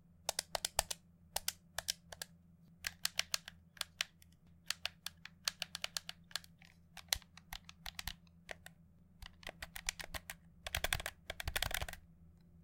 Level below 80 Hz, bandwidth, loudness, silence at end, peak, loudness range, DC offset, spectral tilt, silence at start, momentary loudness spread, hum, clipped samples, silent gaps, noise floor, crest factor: -56 dBFS; 17 kHz; -42 LUFS; 0 s; -10 dBFS; 5 LU; under 0.1%; -0.5 dB/octave; 0.25 s; 15 LU; none; under 0.1%; none; -65 dBFS; 36 dB